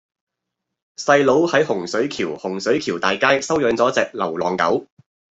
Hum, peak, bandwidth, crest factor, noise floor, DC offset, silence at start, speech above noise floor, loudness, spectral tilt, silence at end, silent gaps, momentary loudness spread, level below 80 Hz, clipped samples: none; -2 dBFS; 8.2 kHz; 18 dB; -81 dBFS; under 0.1%; 1 s; 62 dB; -19 LUFS; -4 dB/octave; 0.5 s; none; 9 LU; -60 dBFS; under 0.1%